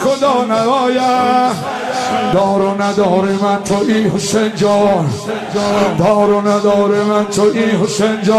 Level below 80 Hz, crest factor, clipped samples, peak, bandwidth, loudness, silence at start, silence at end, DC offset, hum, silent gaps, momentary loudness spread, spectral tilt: -50 dBFS; 12 dB; under 0.1%; -2 dBFS; 13.5 kHz; -13 LUFS; 0 s; 0 s; under 0.1%; none; none; 4 LU; -5.5 dB/octave